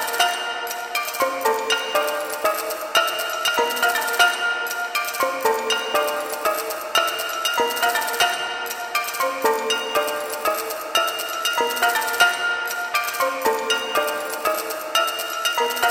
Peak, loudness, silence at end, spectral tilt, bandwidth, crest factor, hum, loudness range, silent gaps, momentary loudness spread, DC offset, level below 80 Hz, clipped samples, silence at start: -2 dBFS; -21 LUFS; 0 s; 0.5 dB/octave; 17 kHz; 20 dB; none; 2 LU; none; 5 LU; under 0.1%; -66 dBFS; under 0.1%; 0 s